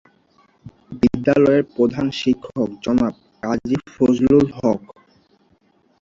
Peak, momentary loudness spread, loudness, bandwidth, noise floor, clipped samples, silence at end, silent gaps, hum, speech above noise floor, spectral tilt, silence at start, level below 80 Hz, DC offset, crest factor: -2 dBFS; 10 LU; -19 LUFS; 7.4 kHz; -59 dBFS; under 0.1%; 1.25 s; none; none; 42 dB; -7 dB/octave; 0.65 s; -48 dBFS; under 0.1%; 18 dB